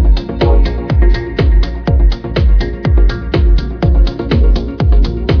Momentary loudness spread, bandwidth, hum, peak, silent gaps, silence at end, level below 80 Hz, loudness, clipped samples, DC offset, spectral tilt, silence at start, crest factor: 2 LU; 5.4 kHz; none; 0 dBFS; none; 0 s; -10 dBFS; -13 LUFS; under 0.1%; under 0.1%; -8.5 dB/octave; 0 s; 10 dB